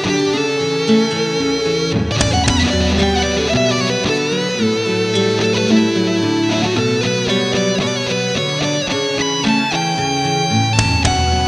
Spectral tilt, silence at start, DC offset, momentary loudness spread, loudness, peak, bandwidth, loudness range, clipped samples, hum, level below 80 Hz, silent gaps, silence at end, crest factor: -4.5 dB/octave; 0 s; under 0.1%; 3 LU; -16 LUFS; 0 dBFS; 12.5 kHz; 1 LU; under 0.1%; none; -32 dBFS; none; 0 s; 16 dB